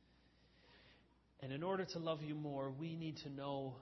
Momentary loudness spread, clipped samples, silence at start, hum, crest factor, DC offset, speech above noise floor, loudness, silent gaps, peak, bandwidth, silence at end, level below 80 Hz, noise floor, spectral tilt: 7 LU; under 0.1%; 0.65 s; none; 20 dB; under 0.1%; 27 dB; -45 LUFS; none; -26 dBFS; 6 kHz; 0 s; -76 dBFS; -72 dBFS; -5.5 dB/octave